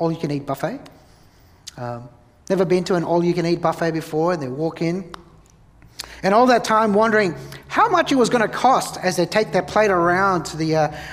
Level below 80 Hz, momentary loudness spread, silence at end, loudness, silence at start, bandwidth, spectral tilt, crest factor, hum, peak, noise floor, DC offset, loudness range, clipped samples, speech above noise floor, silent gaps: -52 dBFS; 15 LU; 0 s; -19 LUFS; 0 s; 15.5 kHz; -5.5 dB/octave; 18 dB; none; -2 dBFS; -51 dBFS; under 0.1%; 6 LU; under 0.1%; 32 dB; none